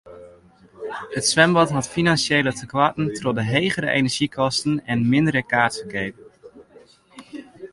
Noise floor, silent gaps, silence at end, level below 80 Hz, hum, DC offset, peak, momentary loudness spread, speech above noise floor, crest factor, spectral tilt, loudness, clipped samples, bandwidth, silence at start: -51 dBFS; none; 0.05 s; -54 dBFS; none; under 0.1%; -2 dBFS; 16 LU; 31 dB; 20 dB; -4.5 dB/octave; -20 LUFS; under 0.1%; 11.5 kHz; 0.05 s